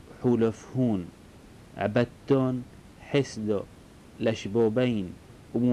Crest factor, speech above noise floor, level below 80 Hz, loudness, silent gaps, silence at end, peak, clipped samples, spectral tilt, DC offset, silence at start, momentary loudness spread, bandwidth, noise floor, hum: 16 dB; 24 dB; -56 dBFS; -28 LUFS; none; 0 s; -12 dBFS; under 0.1%; -7 dB/octave; under 0.1%; 0.1 s; 19 LU; 11.5 kHz; -50 dBFS; none